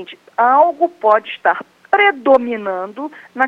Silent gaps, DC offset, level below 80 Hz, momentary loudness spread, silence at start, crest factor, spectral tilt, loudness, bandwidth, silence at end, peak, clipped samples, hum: none; under 0.1%; -64 dBFS; 15 LU; 0 s; 16 dB; -5.5 dB/octave; -15 LUFS; 6.2 kHz; 0 s; 0 dBFS; under 0.1%; none